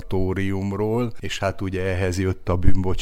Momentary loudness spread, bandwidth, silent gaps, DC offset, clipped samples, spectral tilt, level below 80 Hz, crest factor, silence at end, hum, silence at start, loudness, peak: 3 LU; 10.5 kHz; none; under 0.1%; under 0.1%; -6.5 dB/octave; -30 dBFS; 16 dB; 0 s; none; 0 s; -24 LUFS; -4 dBFS